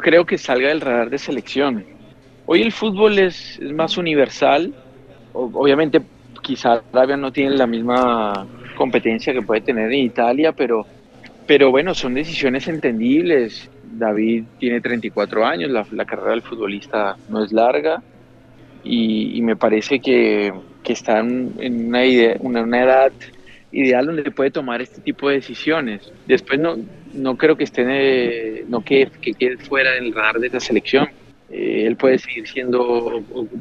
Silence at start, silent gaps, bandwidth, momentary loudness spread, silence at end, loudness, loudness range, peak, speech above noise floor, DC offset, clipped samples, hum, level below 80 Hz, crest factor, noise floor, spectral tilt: 0 s; none; 7.6 kHz; 11 LU; 0 s; -18 LUFS; 3 LU; 0 dBFS; 28 dB; under 0.1%; under 0.1%; none; -54 dBFS; 18 dB; -46 dBFS; -5.5 dB/octave